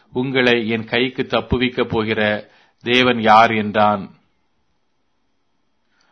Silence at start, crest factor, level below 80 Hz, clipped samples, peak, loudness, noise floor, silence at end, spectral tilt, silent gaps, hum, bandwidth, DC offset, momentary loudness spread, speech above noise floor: 0.15 s; 18 dB; -44 dBFS; under 0.1%; 0 dBFS; -17 LUFS; -70 dBFS; 2.05 s; -6 dB/octave; none; none; 6.6 kHz; under 0.1%; 10 LU; 53 dB